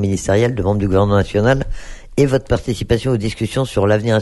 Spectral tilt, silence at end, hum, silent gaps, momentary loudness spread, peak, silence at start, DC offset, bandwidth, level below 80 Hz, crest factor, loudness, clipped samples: -6.5 dB/octave; 0 s; none; none; 6 LU; 0 dBFS; 0 s; under 0.1%; 12 kHz; -30 dBFS; 16 dB; -17 LUFS; under 0.1%